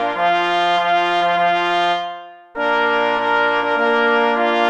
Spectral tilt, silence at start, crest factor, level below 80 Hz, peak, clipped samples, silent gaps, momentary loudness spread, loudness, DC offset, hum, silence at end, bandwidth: -4 dB/octave; 0 s; 16 dB; -58 dBFS; -2 dBFS; under 0.1%; none; 7 LU; -17 LUFS; under 0.1%; none; 0 s; 9.2 kHz